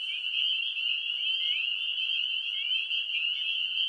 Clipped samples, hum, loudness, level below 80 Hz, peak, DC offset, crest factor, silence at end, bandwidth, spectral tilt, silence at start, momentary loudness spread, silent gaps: under 0.1%; none; -27 LUFS; -80 dBFS; -16 dBFS; under 0.1%; 14 dB; 0 s; 11 kHz; 3.5 dB/octave; 0 s; 2 LU; none